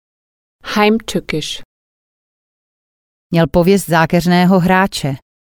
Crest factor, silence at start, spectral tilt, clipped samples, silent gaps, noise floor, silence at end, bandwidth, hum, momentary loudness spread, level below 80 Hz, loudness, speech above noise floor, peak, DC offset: 16 dB; 0.65 s; -6 dB/octave; under 0.1%; 1.65-3.30 s; under -90 dBFS; 0.35 s; 19.5 kHz; none; 13 LU; -40 dBFS; -14 LUFS; over 77 dB; 0 dBFS; under 0.1%